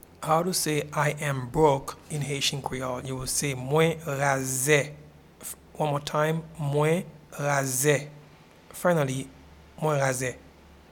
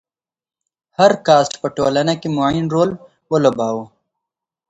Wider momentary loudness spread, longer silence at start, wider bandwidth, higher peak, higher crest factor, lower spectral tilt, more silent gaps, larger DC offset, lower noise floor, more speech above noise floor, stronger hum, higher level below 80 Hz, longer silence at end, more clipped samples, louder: first, 13 LU vs 9 LU; second, 0.2 s vs 1 s; first, 19 kHz vs 8.2 kHz; second, -8 dBFS vs 0 dBFS; about the same, 20 dB vs 18 dB; second, -4 dB/octave vs -5.5 dB/octave; neither; neither; second, -52 dBFS vs -82 dBFS; second, 26 dB vs 66 dB; neither; about the same, -54 dBFS vs -52 dBFS; second, 0.45 s vs 0.85 s; neither; second, -26 LUFS vs -16 LUFS